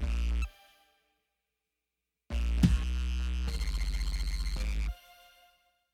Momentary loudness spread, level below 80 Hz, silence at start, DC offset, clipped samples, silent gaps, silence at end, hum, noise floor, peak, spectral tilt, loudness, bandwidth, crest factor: 11 LU; -34 dBFS; 0 s; under 0.1%; under 0.1%; none; 1 s; none; -87 dBFS; -10 dBFS; -5.5 dB/octave; -34 LUFS; 13.5 kHz; 22 dB